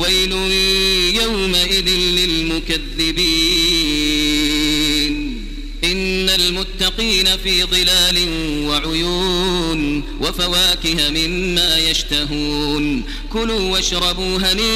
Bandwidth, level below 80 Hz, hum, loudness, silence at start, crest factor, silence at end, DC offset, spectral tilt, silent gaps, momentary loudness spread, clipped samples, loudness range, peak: 16 kHz; -28 dBFS; none; -15 LUFS; 0 s; 16 dB; 0 s; under 0.1%; -2.5 dB/octave; none; 7 LU; under 0.1%; 2 LU; -2 dBFS